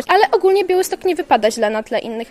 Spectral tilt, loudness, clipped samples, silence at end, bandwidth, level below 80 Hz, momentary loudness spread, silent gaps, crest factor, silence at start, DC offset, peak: -3 dB/octave; -16 LUFS; under 0.1%; 0.05 s; 14 kHz; -54 dBFS; 8 LU; none; 16 dB; 0 s; under 0.1%; 0 dBFS